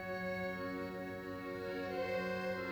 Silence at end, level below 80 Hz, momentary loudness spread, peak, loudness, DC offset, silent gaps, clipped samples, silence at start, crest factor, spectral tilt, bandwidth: 0 s; -66 dBFS; 6 LU; -28 dBFS; -41 LUFS; under 0.1%; none; under 0.1%; 0 s; 12 dB; -6.5 dB/octave; over 20 kHz